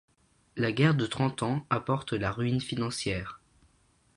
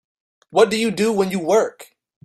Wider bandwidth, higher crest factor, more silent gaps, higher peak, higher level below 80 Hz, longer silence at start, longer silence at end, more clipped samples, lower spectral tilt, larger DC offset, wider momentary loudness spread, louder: second, 11.5 kHz vs 13 kHz; about the same, 22 dB vs 18 dB; neither; second, -8 dBFS vs -2 dBFS; first, -54 dBFS vs -62 dBFS; about the same, 0.55 s vs 0.55 s; first, 0.8 s vs 0.4 s; neither; first, -6 dB/octave vs -4.5 dB/octave; neither; first, 8 LU vs 5 LU; second, -29 LUFS vs -19 LUFS